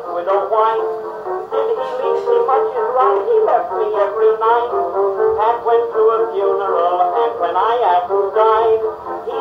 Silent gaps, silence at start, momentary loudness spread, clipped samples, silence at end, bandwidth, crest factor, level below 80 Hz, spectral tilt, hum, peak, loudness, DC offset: none; 0 s; 6 LU; under 0.1%; 0 s; 5.6 kHz; 14 dB; -58 dBFS; -6 dB/octave; none; -2 dBFS; -16 LUFS; under 0.1%